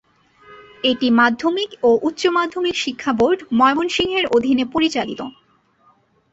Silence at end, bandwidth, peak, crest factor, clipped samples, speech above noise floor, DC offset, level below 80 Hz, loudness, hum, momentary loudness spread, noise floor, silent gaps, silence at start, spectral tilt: 1.05 s; 8 kHz; -2 dBFS; 16 dB; under 0.1%; 40 dB; under 0.1%; -54 dBFS; -18 LUFS; none; 7 LU; -57 dBFS; none; 0.5 s; -4 dB/octave